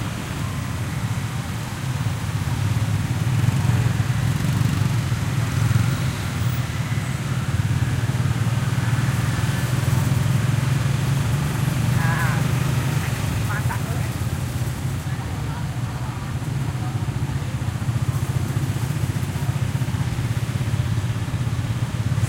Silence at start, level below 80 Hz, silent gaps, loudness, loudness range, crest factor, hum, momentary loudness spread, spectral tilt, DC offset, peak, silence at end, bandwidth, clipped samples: 0 s; -38 dBFS; none; -23 LUFS; 4 LU; 16 dB; none; 6 LU; -6 dB/octave; under 0.1%; -6 dBFS; 0 s; 16 kHz; under 0.1%